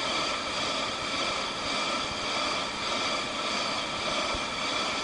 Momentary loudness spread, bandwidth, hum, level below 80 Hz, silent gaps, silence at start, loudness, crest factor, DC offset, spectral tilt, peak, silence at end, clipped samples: 1 LU; 11 kHz; none; -54 dBFS; none; 0 s; -29 LUFS; 14 dB; under 0.1%; -1.5 dB/octave; -16 dBFS; 0 s; under 0.1%